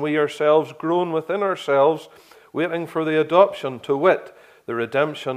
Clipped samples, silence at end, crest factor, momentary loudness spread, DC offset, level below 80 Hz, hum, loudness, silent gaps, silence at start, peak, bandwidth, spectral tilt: under 0.1%; 0 s; 20 dB; 11 LU; under 0.1%; -74 dBFS; none; -21 LUFS; none; 0 s; -2 dBFS; 14.5 kHz; -6 dB/octave